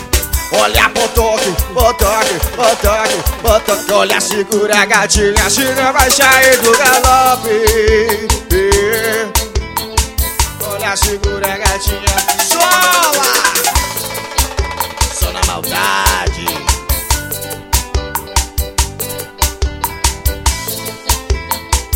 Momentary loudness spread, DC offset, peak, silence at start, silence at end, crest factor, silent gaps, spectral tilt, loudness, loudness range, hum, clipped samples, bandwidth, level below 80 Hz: 9 LU; under 0.1%; 0 dBFS; 0 s; 0 s; 14 dB; none; -2.5 dB/octave; -12 LUFS; 8 LU; none; 0.3%; over 20 kHz; -22 dBFS